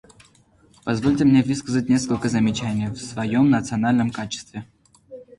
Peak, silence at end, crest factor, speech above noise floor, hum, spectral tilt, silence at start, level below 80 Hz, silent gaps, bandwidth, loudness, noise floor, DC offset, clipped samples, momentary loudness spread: -6 dBFS; 0.15 s; 16 dB; 35 dB; none; -6 dB/octave; 0.85 s; -50 dBFS; none; 11.5 kHz; -21 LUFS; -56 dBFS; under 0.1%; under 0.1%; 13 LU